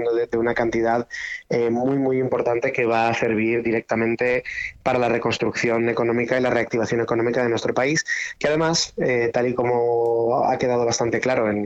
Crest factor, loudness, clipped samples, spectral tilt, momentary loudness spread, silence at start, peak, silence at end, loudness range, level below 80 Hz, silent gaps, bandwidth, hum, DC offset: 14 dB; -21 LUFS; under 0.1%; -5 dB/octave; 3 LU; 0 s; -6 dBFS; 0 s; 1 LU; -54 dBFS; none; 8.2 kHz; none; under 0.1%